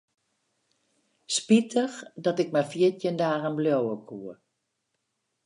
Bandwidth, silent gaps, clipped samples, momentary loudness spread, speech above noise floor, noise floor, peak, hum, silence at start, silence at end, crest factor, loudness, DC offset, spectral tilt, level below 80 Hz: 11 kHz; none; under 0.1%; 14 LU; 53 dB; -79 dBFS; -8 dBFS; none; 1.3 s; 1.15 s; 20 dB; -26 LUFS; under 0.1%; -5 dB/octave; -78 dBFS